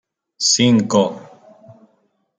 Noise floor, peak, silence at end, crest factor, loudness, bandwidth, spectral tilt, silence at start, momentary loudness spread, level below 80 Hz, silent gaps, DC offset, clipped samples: -64 dBFS; -2 dBFS; 1.15 s; 16 dB; -15 LUFS; 9.6 kHz; -3.5 dB/octave; 0.4 s; 10 LU; -62 dBFS; none; under 0.1%; under 0.1%